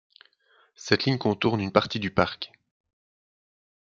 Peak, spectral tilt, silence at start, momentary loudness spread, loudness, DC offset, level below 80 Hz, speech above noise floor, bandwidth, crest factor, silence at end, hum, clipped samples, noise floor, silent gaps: -4 dBFS; -5.5 dB/octave; 0.8 s; 15 LU; -25 LUFS; under 0.1%; -60 dBFS; 39 dB; 7.6 kHz; 26 dB; 1.35 s; none; under 0.1%; -64 dBFS; none